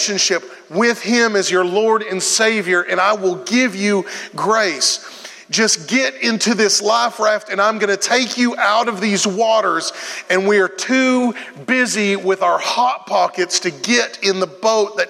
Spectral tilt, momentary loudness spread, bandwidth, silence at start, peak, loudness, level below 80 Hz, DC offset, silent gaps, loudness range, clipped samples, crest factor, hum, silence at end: -2.5 dB/octave; 5 LU; 15.5 kHz; 0 s; 0 dBFS; -16 LUFS; -78 dBFS; under 0.1%; none; 1 LU; under 0.1%; 16 dB; none; 0 s